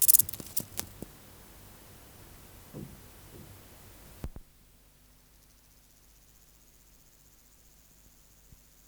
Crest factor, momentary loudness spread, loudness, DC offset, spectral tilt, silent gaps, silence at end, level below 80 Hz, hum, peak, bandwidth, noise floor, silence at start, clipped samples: 34 dB; 20 LU; -28 LUFS; under 0.1%; -1.5 dB/octave; none; 4.45 s; -56 dBFS; 50 Hz at -65 dBFS; -4 dBFS; over 20 kHz; -60 dBFS; 0 s; under 0.1%